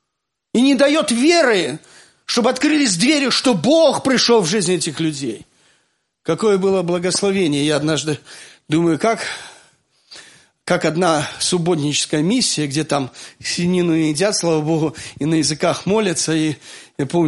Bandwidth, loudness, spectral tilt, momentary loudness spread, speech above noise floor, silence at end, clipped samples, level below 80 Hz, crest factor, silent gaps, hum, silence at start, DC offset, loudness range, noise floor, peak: 11.5 kHz; -17 LUFS; -4 dB/octave; 12 LU; 61 dB; 0 s; under 0.1%; -58 dBFS; 16 dB; none; none; 0.55 s; under 0.1%; 5 LU; -78 dBFS; -2 dBFS